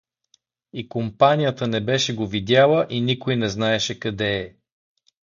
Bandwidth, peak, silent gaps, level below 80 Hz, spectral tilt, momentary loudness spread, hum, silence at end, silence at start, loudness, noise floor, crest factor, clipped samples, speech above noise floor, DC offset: 7.4 kHz; -2 dBFS; none; -54 dBFS; -5 dB/octave; 12 LU; none; 0.8 s; 0.75 s; -21 LUFS; -65 dBFS; 20 dB; under 0.1%; 44 dB; under 0.1%